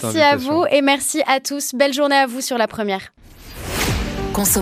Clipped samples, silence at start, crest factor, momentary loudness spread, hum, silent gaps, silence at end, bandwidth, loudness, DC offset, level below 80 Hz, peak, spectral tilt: under 0.1%; 0 s; 16 dB; 9 LU; none; none; 0 s; 15.5 kHz; -18 LUFS; under 0.1%; -36 dBFS; -2 dBFS; -3 dB/octave